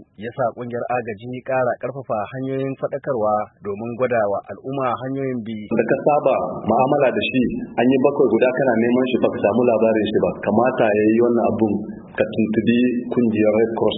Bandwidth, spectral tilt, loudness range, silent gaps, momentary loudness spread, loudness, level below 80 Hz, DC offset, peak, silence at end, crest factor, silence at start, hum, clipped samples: 4 kHz; -11.5 dB/octave; 6 LU; none; 9 LU; -20 LUFS; -56 dBFS; under 0.1%; -2 dBFS; 0 s; 16 dB; 0 s; none; under 0.1%